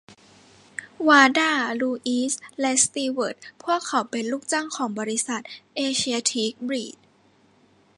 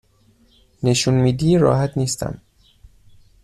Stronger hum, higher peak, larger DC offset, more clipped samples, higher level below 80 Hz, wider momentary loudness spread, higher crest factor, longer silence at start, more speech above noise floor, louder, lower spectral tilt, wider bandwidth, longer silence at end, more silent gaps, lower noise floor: neither; about the same, -2 dBFS vs -4 dBFS; neither; neither; second, -70 dBFS vs -44 dBFS; first, 14 LU vs 11 LU; first, 24 dB vs 18 dB; second, 0.1 s vs 0.8 s; about the same, 36 dB vs 39 dB; second, -23 LUFS vs -18 LUFS; second, -1.5 dB/octave vs -5.5 dB/octave; second, 11.5 kHz vs 13.5 kHz; about the same, 1.05 s vs 1.05 s; neither; about the same, -59 dBFS vs -56 dBFS